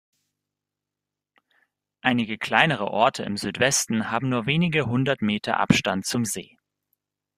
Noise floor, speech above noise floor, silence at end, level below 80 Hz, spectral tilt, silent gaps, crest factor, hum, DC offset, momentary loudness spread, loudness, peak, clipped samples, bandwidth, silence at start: -87 dBFS; 64 dB; 0.95 s; -58 dBFS; -4 dB/octave; none; 24 dB; 50 Hz at -50 dBFS; under 0.1%; 6 LU; -23 LUFS; -2 dBFS; under 0.1%; 15.5 kHz; 2.05 s